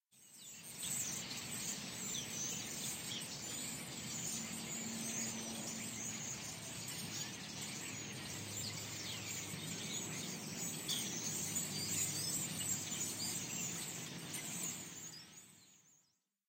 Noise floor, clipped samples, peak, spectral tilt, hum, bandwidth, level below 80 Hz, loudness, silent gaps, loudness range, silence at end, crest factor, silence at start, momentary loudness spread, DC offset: -79 dBFS; under 0.1%; -26 dBFS; -1.5 dB/octave; none; 16 kHz; -74 dBFS; -41 LUFS; none; 5 LU; 0.5 s; 20 dB; 0.15 s; 7 LU; under 0.1%